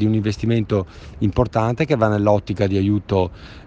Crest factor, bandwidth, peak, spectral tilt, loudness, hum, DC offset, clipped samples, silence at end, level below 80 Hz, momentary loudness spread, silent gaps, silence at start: 18 dB; 7.6 kHz; -2 dBFS; -8 dB/octave; -20 LUFS; none; under 0.1%; under 0.1%; 0.05 s; -40 dBFS; 6 LU; none; 0 s